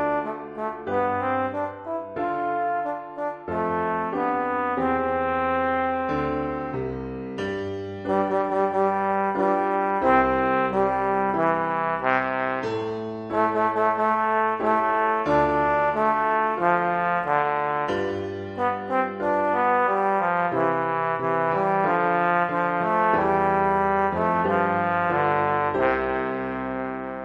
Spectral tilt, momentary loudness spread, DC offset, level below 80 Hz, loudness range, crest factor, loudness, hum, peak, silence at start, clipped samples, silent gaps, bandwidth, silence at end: -7.5 dB/octave; 8 LU; under 0.1%; -52 dBFS; 5 LU; 18 dB; -24 LUFS; none; -6 dBFS; 0 s; under 0.1%; none; 9 kHz; 0 s